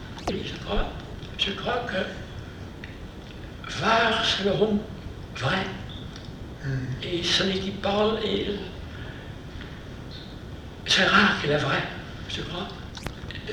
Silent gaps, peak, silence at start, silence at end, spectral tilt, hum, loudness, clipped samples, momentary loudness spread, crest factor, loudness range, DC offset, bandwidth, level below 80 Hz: none; -6 dBFS; 0 s; 0 s; -4.5 dB/octave; none; -25 LUFS; under 0.1%; 18 LU; 22 dB; 6 LU; under 0.1%; 15.5 kHz; -42 dBFS